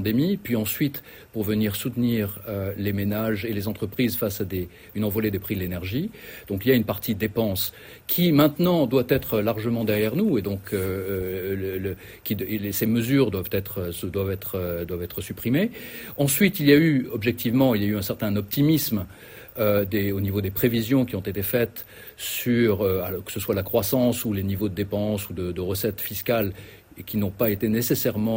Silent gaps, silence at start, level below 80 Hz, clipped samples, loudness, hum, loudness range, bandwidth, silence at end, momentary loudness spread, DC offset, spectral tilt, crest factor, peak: none; 0 s; -52 dBFS; under 0.1%; -24 LUFS; none; 5 LU; 16.5 kHz; 0 s; 10 LU; under 0.1%; -6 dB/octave; 20 dB; -4 dBFS